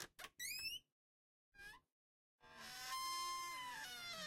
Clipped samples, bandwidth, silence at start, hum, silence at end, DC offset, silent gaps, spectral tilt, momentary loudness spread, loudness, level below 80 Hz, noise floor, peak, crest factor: under 0.1%; 16.5 kHz; 0 s; none; 0 s; under 0.1%; 0.92-1.52 s, 1.92-2.39 s; 0.5 dB/octave; 16 LU; -47 LUFS; -78 dBFS; under -90 dBFS; -32 dBFS; 18 dB